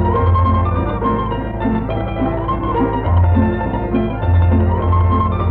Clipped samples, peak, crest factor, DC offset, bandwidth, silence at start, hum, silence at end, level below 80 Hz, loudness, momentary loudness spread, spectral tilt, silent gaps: under 0.1%; -2 dBFS; 12 dB; under 0.1%; 3.8 kHz; 0 s; none; 0 s; -24 dBFS; -17 LUFS; 6 LU; -11.5 dB/octave; none